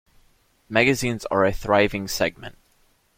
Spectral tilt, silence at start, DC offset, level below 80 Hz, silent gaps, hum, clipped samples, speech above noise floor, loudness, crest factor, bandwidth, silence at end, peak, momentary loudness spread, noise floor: -4.5 dB/octave; 0.7 s; under 0.1%; -44 dBFS; none; none; under 0.1%; 40 dB; -22 LUFS; 20 dB; 16.5 kHz; 0.65 s; -4 dBFS; 7 LU; -62 dBFS